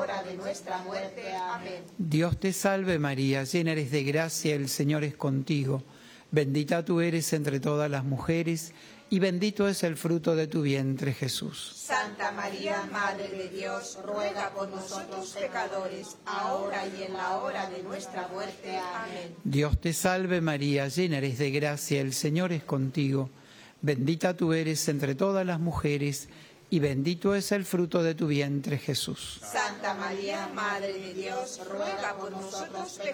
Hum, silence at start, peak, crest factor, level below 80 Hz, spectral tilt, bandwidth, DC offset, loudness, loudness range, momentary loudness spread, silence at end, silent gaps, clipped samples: none; 0 s; -12 dBFS; 18 dB; -52 dBFS; -5 dB/octave; over 20 kHz; under 0.1%; -30 LUFS; 5 LU; 9 LU; 0 s; none; under 0.1%